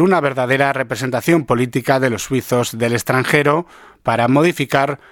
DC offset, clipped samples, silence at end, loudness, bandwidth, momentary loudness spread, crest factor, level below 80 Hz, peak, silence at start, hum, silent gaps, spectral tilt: under 0.1%; under 0.1%; 0.15 s; -17 LUFS; 18.5 kHz; 6 LU; 16 dB; -52 dBFS; 0 dBFS; 0 s; none; none; -5.5 dB/octave